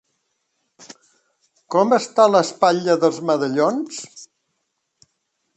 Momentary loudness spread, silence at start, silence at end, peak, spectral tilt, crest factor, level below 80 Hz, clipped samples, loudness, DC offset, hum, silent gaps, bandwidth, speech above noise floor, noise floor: 13 LU; 0.9 s; 1.3 s; 0 dBFS; -5 dB/octave; 20 dB; -72 dBFS; under 0.1%; -18 LUFS; under 0.1%; none; none; 8.8 kHz; 56 dB; -74 dBFS